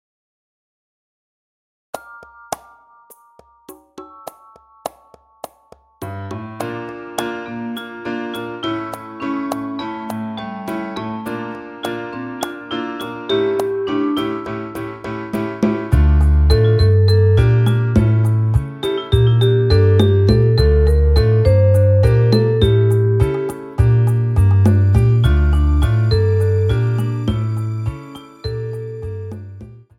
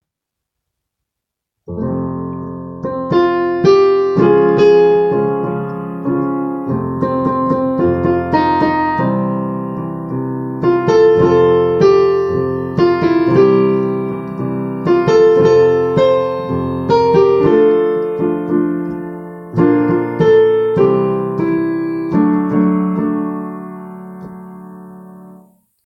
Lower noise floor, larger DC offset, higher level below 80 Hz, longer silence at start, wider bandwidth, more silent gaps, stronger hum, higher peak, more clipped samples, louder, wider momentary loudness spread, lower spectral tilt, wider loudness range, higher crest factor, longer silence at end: second, -50 dBFS vs -80 dBFS; neither; first, -24 dBFS vs -46 dBFS; first, 1.95 s vs 1.7 s; first, 13.5 kHz vs 7 kHz; neither; neither; about the same, 0 dBFS vs 0 dBFS; neither; second, -17 LUFS vs -14 LUFS; first, 17 LU vs 13 LU; about the same, -8 dB/octave vs -8.5 dB/octave; first, 22 LU vs 5 LU; about the same, 16 dB vs 14 dB; second, 0.2 s vs 0.55 s